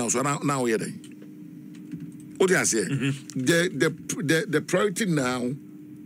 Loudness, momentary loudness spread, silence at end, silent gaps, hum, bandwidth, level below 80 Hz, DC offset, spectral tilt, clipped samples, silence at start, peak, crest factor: -25 LUFS; 21 LU; 0 s; none; none; 16 kHz; -68 dBFS; under 0.1%; -4 dB/octave; under 0.1%; 0 s; -8 dBFS; 18 dB